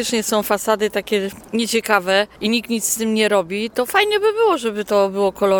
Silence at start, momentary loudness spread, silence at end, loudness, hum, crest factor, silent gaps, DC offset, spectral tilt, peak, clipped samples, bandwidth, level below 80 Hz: 0 s; 6 LU; 0 s; -18 LUFS; none; 18 dB; none; under 0.1%; -3 dB/octave; 0 dBFS; under 0.1%; 19 kHz; -54 dBFS